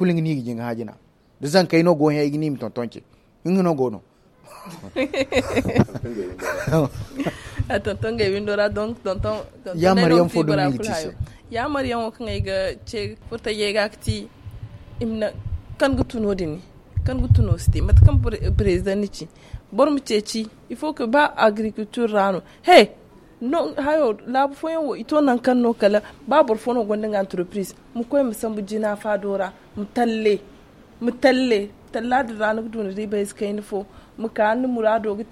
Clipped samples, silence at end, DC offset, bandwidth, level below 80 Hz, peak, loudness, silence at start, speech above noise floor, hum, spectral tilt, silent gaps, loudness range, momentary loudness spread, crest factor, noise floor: under 0.1%; 0.05 s; under 0.1%; 14.5 kHz; -32 dBFS; 0 dBFS; -21 LUFS; 0 s; 27 dB; none; -6.5 dB/octave; none; 6 LU; 13 LU; 20 dB; -47 dBFS